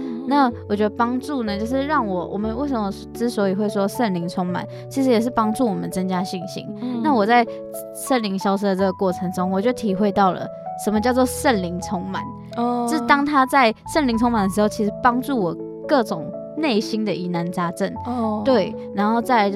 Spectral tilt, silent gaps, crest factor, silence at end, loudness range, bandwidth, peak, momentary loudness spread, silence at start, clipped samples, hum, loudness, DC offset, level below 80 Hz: -5.5 dB/octave; none; 20 dB; 0 s; 4 LU; 15.5 kHz; -2 dBFS; 9 LU; 0 s; under 0.1%; none; -21 LUFS; under 0.1%; -48 dBFS